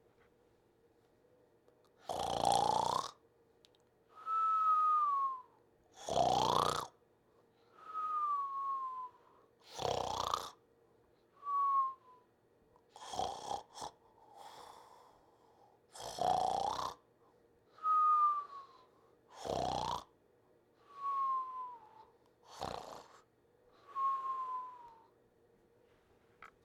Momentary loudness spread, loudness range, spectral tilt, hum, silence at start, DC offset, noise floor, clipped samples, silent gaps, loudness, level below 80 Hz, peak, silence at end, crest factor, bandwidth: 21 LU; 9 LU; -3.5 dB/octave; none; 2.05 s; under 0.1%; -71 dBFS; under 0.1%; none; -36 LUFS; -68 dBFS; -16 dBFS; 0.2 s; 24 dB; 17.5 kHz